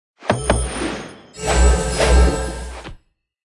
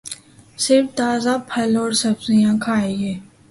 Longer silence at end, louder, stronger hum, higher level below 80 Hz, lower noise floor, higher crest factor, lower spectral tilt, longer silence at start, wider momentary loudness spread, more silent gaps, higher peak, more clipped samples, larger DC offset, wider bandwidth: first, 0.5 s vs 0.25 s; about the same, -19 LUFS vs -19 LUFS; neither; first, -20 dBFS vs -56 dBFS; first, -51 dBFS vs -39 dBFS; about the same, 18 dB vs 16 dB; about the same, -4.5 dB/octave vs -4.5 dB/octave; first, 0.2 s vs 0.05 s; first, 19 LU vs 11 LU; neither; about the same, -2 dBFS vs -4 dBFS; neither; neither; about the same, 12 kHz vs 11.5 kHz